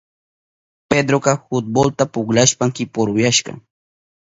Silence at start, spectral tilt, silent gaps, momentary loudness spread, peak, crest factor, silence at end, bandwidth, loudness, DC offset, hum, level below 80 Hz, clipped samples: 0.9 s; -4 dB/octave; none; 6 LU; 0 dBFS; 18 dB; 0.75 s; 8 kHz; -17 LUFS; under 0.1%; none; -52 dBFS; under 0.1%